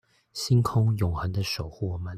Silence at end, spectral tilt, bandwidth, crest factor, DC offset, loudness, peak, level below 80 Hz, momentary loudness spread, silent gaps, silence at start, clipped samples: 0 s; -6 dB/octave; 15 kHz; 14 dB; under 0.1%; -27 LUFS; -12 dBFS; -48 dBFS; 10 LU; none; 0.35 s; under 0.1%